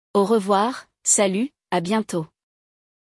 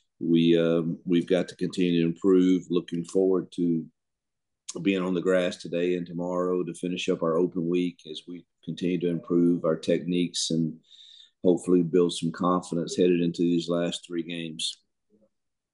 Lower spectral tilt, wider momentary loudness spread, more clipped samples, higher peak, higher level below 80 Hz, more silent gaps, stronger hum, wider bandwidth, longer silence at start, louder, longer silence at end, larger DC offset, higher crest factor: second, -3.5 dB/octave vs -6 dB/octave; about the same, 10 LU vs 10 LU; neither; about the same, -6 dBFS vs -8 dBFS; about the same, -70 dBFS vs -72 dBFS; neither; neither; about the same, 12 kHz vs 11.5 kHz; about the same, 0.15 s vs 0.2 s; first, -21 LUFS vs -26 LUFS; second, 0.85 s vs 1 s; neither; about the same, 16 dB vs 18 dB